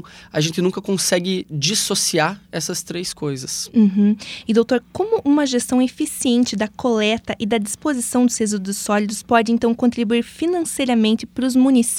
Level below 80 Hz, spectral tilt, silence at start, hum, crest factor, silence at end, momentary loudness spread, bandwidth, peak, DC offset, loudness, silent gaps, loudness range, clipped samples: -54 dBFS; -4 dB/octave; 0.05 s; none; 16 dB; 0 s; 7 LU; 16.5 kHz; -2 dBFS; under 0.1%; -19 LUFS; none; 2 LU; under 0.1%